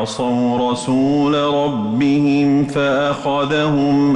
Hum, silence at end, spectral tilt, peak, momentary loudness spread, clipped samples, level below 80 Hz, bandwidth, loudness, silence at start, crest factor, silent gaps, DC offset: none; 0 s; -6.5 dB/octave; -8 dBFS; 4 LU; under 0.1%; -50 dBFS; 10 kHz; -16 LUFS; 0 s; 8 dB; none; under 0.1%